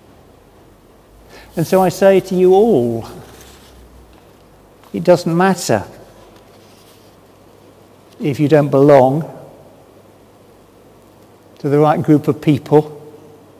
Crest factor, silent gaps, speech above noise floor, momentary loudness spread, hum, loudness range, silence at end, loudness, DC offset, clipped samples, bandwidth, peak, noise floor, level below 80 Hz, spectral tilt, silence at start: 16 dB; none; 34 dB; 18 LU; none; 4 LU; 0.5 s; -14 LUFS; under 0.1%; under 0.1%; 16 kHz; 0 dBFS; -46 dBFS; -50 dBFS; -7 dB/octave; 1.55 s